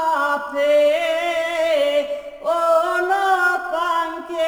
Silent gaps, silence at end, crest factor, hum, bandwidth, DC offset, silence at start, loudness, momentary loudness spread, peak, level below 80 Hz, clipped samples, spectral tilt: none; 0 s; 12 dB; none; over 20 kHz; under 0.1%; 0 s; -19 LUFS; 7 LU; -6 dBFS; -60 dBFS; under 0.1%; -1.5 dB/octave